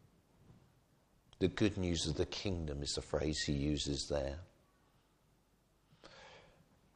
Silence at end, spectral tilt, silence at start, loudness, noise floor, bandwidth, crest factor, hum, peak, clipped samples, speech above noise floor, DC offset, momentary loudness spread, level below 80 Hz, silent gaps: 0.55 s; -5 dB/octave; 0.5 s; -38 LUFS; -73 dBFS; 10.5 kHz; 22 dB; none; -18 dBFS; under 0.1%; 36 dB; under 0.1%; 19 LU; -52 dBFS; none